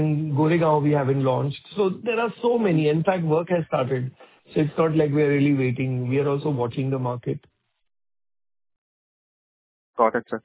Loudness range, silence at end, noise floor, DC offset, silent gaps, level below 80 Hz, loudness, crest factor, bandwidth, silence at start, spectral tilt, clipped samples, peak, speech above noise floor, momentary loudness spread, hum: 9 LU; 0.05 s; under -90 dBFS; under 0.1%; 8.78-9.94 s; -62 dBFS; -23 LUFS; 18 dB; 4 kHz; 0 s; -12 dB/octave; under 0.1%; -4 dBFS; over 68 dB; 8 LU; none